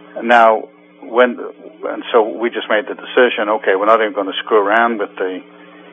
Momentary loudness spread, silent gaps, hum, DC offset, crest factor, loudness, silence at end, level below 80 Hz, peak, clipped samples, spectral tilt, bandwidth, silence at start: 13 LU; none; none; under 0.1%; 16 dB; -15 LUFS; 0.3 s; -80 dBFS; 0 dBFS; under 0.1%; -5 dB/octave; 8 kHz; 0.15 s